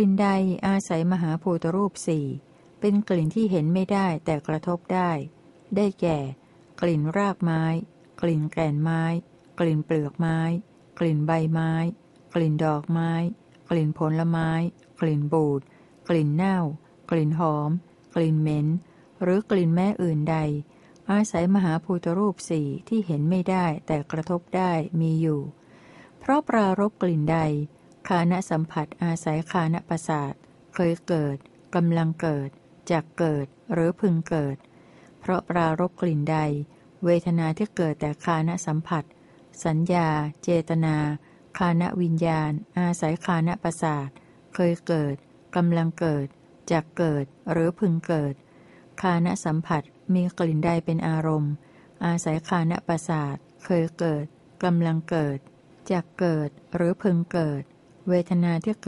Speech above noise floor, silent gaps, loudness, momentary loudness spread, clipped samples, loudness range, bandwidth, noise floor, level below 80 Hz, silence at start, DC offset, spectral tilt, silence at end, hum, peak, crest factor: 28 dB; none; -25 LUFS; 8 LU; under 0.1%; 2 LU; 11.5 kHz; -52 dBFS; -58 dBFS; 0 s; under 0.1%; -7.5 dB/octave; 0 s; none; -10 dBFS; 16 dB